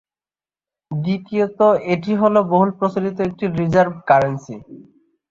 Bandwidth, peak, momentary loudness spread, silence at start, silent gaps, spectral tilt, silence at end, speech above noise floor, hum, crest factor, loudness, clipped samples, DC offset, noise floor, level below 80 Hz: 7.4 kHz; -2 dBFS; 10 LU; 0.9 s; none; -8 dB/octave; 0.5 s; over 73 dB; none; 18 dB; -18 LUFS; under 0.1%; under 0.1%; under -90 dBFS; -54 dBFS